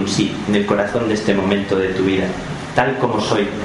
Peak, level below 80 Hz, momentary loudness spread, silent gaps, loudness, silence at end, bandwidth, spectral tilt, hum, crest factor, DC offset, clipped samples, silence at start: 0 dBFS; -44 dBFS; 3 LU; none; -18 LUFS; 0 s; 11.5 kHz; -5.5 dB/octave; none; 18 dB; under 0.1%; under 0.1%; 0 s